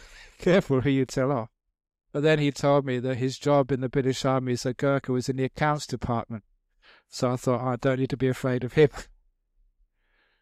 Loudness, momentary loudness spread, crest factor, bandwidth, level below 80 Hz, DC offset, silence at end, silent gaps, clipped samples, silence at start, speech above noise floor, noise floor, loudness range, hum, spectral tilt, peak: -26 LUFS; 7 LU; 18 dB; 14 kHz; -52 dBFS; under 0.1%; 1.4 s; none; under 0.1%; 0.05 s; 44 dB; -69 dBFS; 3 LU; none; -6.5 dB/octave; -8 dBFS